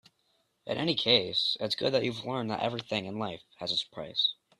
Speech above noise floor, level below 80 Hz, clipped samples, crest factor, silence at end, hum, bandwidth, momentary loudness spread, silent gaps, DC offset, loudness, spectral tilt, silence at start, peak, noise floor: 43 dB; -70 dBFS; under 0.1%; 22 dB; 0.25 s; none; 13 kHz; 13 LU; none; under 0.1%; -30 LUFS; -4.5 dB/octave; 0.65 s; -10 dBFS; -74 dBFS